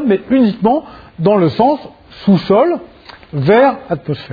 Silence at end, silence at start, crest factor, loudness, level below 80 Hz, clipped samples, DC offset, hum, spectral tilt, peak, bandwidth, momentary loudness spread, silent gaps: 0 s; 0 s; 14 dB; -14 LUFS; -48 dBFS; under 0.1%; under 0.1%; none; -9.5 dB/octave; 0 dBFS; 5 kHz; 11 LU; none